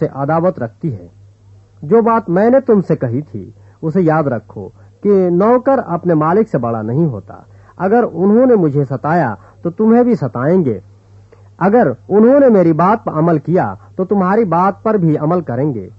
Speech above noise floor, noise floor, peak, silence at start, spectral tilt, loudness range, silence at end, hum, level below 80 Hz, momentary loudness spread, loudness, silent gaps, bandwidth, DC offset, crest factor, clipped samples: 31 dB; -44 dBFS; 0 dBFS; 0 s; -11 dB/octave; 3 LU; 0.1 s; none; -52 dBFS; 13 LU; -13 LUFS; none; 6 kHz; under 0.1%; 14 dB; under 0.1%